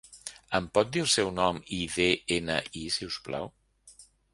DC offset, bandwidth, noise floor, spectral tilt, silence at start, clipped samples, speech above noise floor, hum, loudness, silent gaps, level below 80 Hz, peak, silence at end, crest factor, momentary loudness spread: under 0.1%; 11.5 kHz; -56 dBFS; -3 dB/octave; 0.1 s; under 0.1%; 27 dB; none; -29 LUFS; none; -54 dBFS; -8 dBFS; 0.3 s; 22 dB; 12 LU